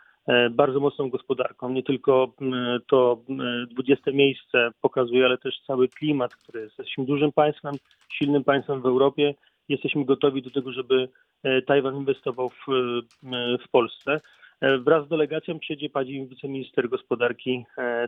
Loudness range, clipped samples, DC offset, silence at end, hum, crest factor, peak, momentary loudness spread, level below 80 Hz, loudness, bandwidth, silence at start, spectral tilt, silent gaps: 3 LU; under 0.1%; under 0.1%; 0 s; none; 22 dB; -2 dBFS; 10 LU; -70 dBFS; -24 LUFS; 4 kHz; 0.25 s; -8 dB/octave; none